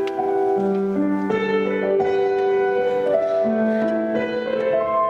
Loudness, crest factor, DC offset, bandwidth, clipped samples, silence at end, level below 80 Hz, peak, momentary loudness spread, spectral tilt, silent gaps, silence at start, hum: -21 LUFS; 14 dB; under 0.1%; 7 kHz; under 0.1%; 0 s; -58 dBFS; -6 dBFS; 3 LU; -7.5 dB/octave; none; 0 s; none